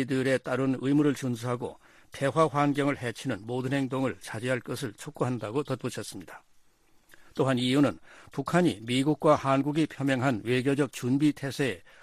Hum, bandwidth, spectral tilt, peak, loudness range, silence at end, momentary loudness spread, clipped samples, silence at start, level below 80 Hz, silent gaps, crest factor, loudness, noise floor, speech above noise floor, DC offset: none; 15 kHz; -6 dB/octave; -10 dBFS; 6 LU; 0.25 s; 11 LU; under 0.1%; 0 s; -64 dBFS; none; 18 dB; -28 LUFS; -61 dBFS; 33 dB; under 0.1%